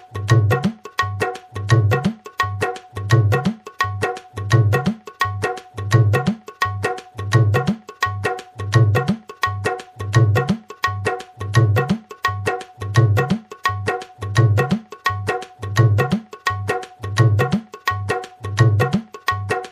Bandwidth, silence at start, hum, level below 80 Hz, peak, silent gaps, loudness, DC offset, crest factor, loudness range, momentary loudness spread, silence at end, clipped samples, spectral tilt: 15 kHz; 0.1 s; none; -46 dBFS; -2 dBFS; none; -20 LUFS; under 0.1%; 18 dB; 1 LU; 9 LU; 0 s; under 0.1%; -6.5 dB/octave